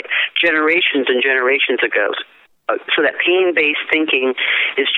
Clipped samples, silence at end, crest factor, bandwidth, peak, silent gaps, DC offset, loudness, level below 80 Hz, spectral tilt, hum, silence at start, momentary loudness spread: under 0.1%; 0 s; 16 dB; 4.2 kHz; 0 dBFS; none; under 0.1%; -15 LUFS; -64 dBFS; -4.5 dB/octave; none; 0.05 s; 8 LU